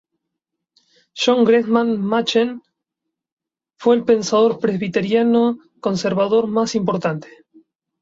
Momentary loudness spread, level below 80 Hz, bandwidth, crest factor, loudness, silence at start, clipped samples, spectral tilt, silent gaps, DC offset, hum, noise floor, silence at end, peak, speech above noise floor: 9 LU; -62 dBFS; 7.8 kHz; 16 dB; -18 LUFS; 1.15 s; under 0.1%; -5.5 dB/octave; 3.32-3.37 s; under 0.1%; none; -81 dBFS; 0.75 s; -4 dBFS; 64 dB